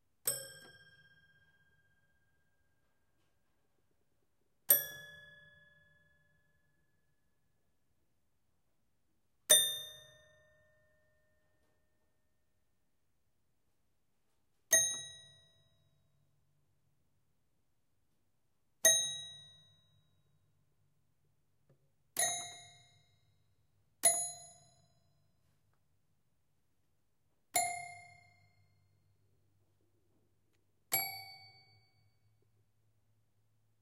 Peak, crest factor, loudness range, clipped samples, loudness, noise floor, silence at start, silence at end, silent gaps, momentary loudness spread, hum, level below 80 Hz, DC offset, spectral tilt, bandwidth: -10 dBFS; 32 dB; 9 LU; under 0.1%; -31 LUFS; -84 dBFS; 0.25 s; 2.45 s; none; 24 LU; none; -86 dBFS; under 0.1%; 1.5 dB/octave; 15.5 kHz